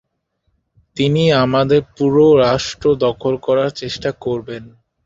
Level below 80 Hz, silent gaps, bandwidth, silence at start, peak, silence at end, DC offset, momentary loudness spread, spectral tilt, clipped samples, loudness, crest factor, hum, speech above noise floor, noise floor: -46 dBFS; none; 7.8 kHz; 0.95 s; -2 dBFS; 0.4 s; under 0.1%; 12 LU; -6 dB/octave; under 0.1%; -16 LUFS; 16 dB; none; 53 dB; -68 dBFS